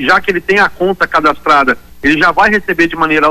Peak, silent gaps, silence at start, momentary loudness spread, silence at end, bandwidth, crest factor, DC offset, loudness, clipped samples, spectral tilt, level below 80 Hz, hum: 0 dBFS; none; 0 s; 4 LU; 0 s; 15.5 kHz; 10 dB; under 0.1%; -11 LUFS; under 0.1%; -5 dB/octave; -38 dBFS; none